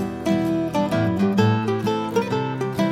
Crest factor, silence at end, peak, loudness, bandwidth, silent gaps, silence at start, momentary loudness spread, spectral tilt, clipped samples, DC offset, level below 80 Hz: 16 dB; 0 s; -6 dBFS; -22 LUFS; 15.5 kHz; none; 0 s; 5 LU; -7 dB/octave; under 0.1%; under 0.1%; -52 dBFS